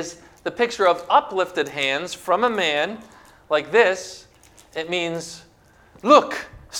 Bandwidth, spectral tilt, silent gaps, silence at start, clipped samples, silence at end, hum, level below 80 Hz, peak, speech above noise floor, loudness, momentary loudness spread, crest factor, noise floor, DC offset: 16.5 kHz; -3 dB/octave; none; 0 s; under 0.1%; 0 s; none; -58 dBFS; 0 dBFS; 32 dB; -21 LUFS; 19 LU; 22 dB; -52 dBFS; under 0.1%